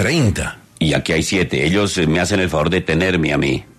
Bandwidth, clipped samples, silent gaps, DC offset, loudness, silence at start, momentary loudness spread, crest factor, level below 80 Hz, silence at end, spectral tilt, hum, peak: 14 kHz; under 0.1%; none; under 0.1%; -17 LUFS; 0 s; 3 LU; 14 dB; -38 dBFS; 0.15 s; -5 dB/octave; none; -2 dBFS